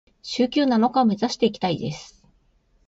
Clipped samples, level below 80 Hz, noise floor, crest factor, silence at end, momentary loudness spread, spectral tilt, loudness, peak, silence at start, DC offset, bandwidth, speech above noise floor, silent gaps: under 0.1%; -60 dBFS; -62 dBFS; 16 dB; 0.8 s; 12 LU; -5.5 dB/octave; -22 LUFS; -6 dBFS; 0.25 s; under 0.1%; 7.8 kHz; 41 dB; none